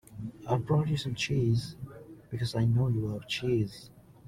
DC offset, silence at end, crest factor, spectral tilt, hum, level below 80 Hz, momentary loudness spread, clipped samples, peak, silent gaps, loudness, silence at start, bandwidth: under 0.1%; 0.3 s; 16 dB; -6.5 dB/octave; none; -56 dBFS; 16 LU; under 0.1%; -14 dBFS; none; -30 LUFS; 0.1 s; 13.5 kHz